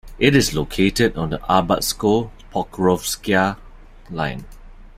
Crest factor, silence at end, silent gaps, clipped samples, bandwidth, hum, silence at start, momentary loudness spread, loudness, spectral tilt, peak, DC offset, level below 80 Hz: 20 dB; 0.1 s; none; under 0.1%; 16 kHz; none; 0.05 s; 11 LU; -19 LUFS; -4.5 dB/octave; 0 dBFS; under 0.1%; -38 dBFS